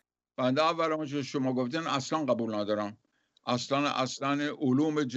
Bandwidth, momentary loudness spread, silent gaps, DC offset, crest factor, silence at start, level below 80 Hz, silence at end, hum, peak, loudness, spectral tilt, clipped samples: 8.2 kHz; 6 LU; none; under 0.1%; 18 dB; 0.4 s; -80 dBFS; 0 s; none; -12 dBFS; -30 LUFS; -5 dB/octave; under 0.1%